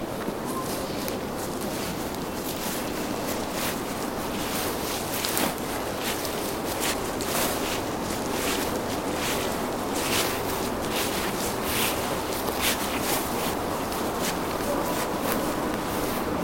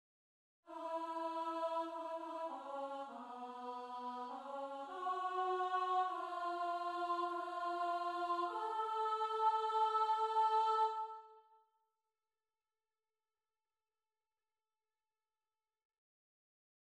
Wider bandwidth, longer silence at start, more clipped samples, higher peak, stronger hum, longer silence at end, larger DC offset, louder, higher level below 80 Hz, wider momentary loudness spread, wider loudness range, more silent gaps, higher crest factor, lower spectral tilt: first, 17 kHz vs 11.5 kHz; second, 0 s vs 0.65 s; neither; first, -2 dBFS vs -24 dBFS; neither; second, 0 s vs 5.5 s; neither; first, -27 LUFS vs -40 LUFS; first, -46 dBFS vs under -90 dBFS; second, 5 LU vs 12 LU; second, 3 LU vs 8 LU; neither; first, 26 dB vs 18 dB; about the same, -3 dB/octave vs -2 dB/octave